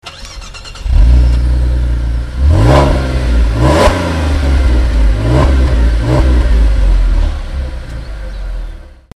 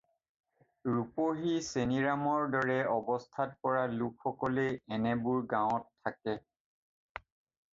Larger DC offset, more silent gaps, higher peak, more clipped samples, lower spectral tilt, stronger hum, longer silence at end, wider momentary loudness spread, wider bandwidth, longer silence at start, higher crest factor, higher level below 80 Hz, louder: neither; neither; first, 0 dBFS vs -16 dBFS; first, 0.2% vs under 0.1%; about the same, -7 dB/octave vs -6 dB/octave; neither; second, 0.35 s vs 1.35 s; first, 16 LU vs 10 LU; first, 11 kHz vs 7.8 kHz; second, 0.05 s vs 0.85 s; second, 10 dB vs 18 dB; first, -12 dBFS vs -66 dBFS; first, -12 LUFS vs -33 LUFS